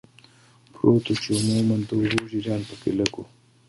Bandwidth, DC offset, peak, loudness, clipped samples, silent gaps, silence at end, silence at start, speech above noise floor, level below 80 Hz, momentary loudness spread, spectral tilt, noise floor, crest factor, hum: 11.5 kHz; under 0.1%; -2 dBFS; -24 LUFS; under 0.1%; none; 0.45 s; 0.85 s; 32 dB; -54 dBFS; 7 LU; -5.5 dB/octave; -55 dBFS; 24 dB; none